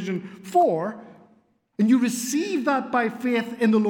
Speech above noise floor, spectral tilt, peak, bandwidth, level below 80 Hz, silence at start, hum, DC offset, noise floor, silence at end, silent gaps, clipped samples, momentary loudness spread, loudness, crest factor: 39 dB; -5 dB/octave; -8 dBFS; 17.5 kHz; -78 dBFS; 0 s; none; under 0.1%; -62 dBFS; 0 s; none; under 0.1%; 12 LU; -23 LUFS; 14 dB